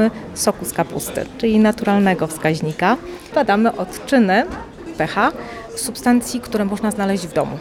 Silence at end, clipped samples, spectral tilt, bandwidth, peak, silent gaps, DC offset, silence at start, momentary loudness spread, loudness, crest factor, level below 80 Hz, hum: 0 s; under 0.1%; -5 dB/octave; 17.5 kHz; -2 dBFS; none; under 0.1%; 0 s; 10 LU; -19 LUFS; 16 dB; -46 dBFS; none